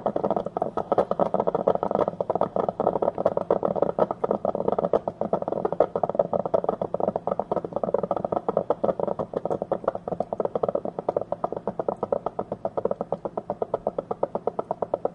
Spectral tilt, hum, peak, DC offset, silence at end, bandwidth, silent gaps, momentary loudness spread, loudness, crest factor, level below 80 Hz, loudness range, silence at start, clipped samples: -9.5 dB/octave; none; -4 dBFS; under 0.1%; 0 s; 6.6 kHz; none; 6 LU; -27 LUFS; 22 dB; -58 dBFS; 4 LU; 0 s; under 0.1%